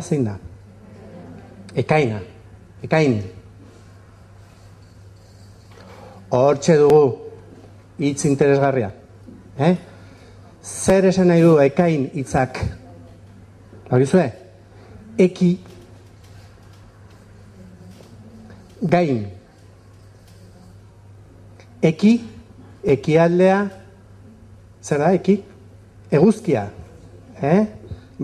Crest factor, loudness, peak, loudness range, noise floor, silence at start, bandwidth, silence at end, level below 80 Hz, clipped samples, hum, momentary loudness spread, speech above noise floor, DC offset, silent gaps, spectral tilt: 18 dB; -18 LUFS; -4 dBFS; 8 LU; -47 dBFS; 0 s; 12.5 kHz; 0 s; -48 dBFS; under 0.1%; none; 23 LU; 30 dB; under 0.1%; none; -7 dB/octave